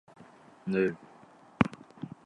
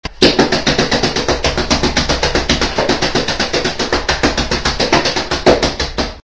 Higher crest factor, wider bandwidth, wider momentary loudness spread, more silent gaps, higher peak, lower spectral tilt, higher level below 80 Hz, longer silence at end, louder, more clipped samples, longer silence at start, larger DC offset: first, 30 dB vs 14 dB; first, 10 kHz vs 8 kHz; first, 16 LU vs 4 LU; neither; second, -4 dBFS vs 0 dBFS; first, -8 dB/octave vs -3.5 dB/octave; second, -60 dBFS vs -26 dBFS; about the same, 0.15 s vs 0.1 s; second, -31 LUFS vs -14 LUFS; neither; first, 0.2 s vs 0.05 s; neither